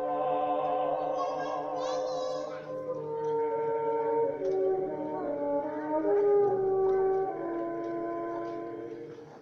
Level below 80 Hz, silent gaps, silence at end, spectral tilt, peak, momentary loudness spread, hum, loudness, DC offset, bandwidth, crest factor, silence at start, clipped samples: -66 dBFS; none; 0 s; -6.5 dB/octave; -18 dBFS; 10 LU; none; -31 LUFS; under 0.1%; 7.2 kHz; 14 dB; 0 s; under 0.1%